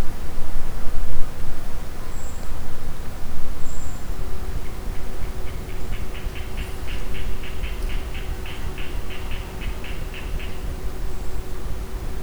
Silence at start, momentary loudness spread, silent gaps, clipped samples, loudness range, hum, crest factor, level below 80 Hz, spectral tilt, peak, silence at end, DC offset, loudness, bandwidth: 0 s; 3 LU; none; under 0.1%; 2 LU; none; 16 dB; -26 dBFS; -5 dB/octave; 0 dBFS; 0 s; under 0.1%; -33 LUFS; over 20 kHz